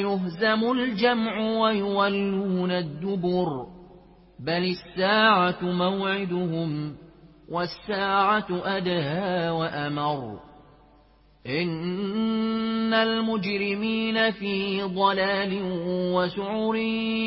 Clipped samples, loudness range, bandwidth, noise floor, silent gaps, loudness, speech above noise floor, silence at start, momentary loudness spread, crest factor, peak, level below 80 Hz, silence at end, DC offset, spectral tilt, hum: under 0.1%; 4 LU; 5.8 kHz; -57 dBFS; none; -25 LUFS; 32 dB; 0 s; 8 LU; 18 dB; -8 dBFS; -58 dBFS; 0 s; under 0.1%; -10 dB/octave; none